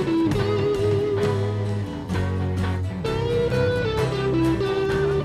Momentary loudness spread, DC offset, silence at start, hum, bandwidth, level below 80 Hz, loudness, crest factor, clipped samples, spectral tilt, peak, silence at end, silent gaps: 5 LU; under 0.1%; 0 s; none; 13 kHz; -40 dBFS; -23 LUFS; 14 dB; under 0.1%; -7.5 dB/octave; -8 dBFS; 0 s; none